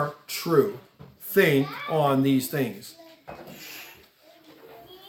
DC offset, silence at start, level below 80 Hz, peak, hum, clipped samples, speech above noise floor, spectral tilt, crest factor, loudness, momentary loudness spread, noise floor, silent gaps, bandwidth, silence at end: under 0.1%; 0 s; -70 dBFS; -6 dBFS; none; under 0.1%; 32 dB; -5.5 dB/octave; 22 dB; -24 LUFS; 22 LU; -55 dBFS; none; 18 kHz; 0 s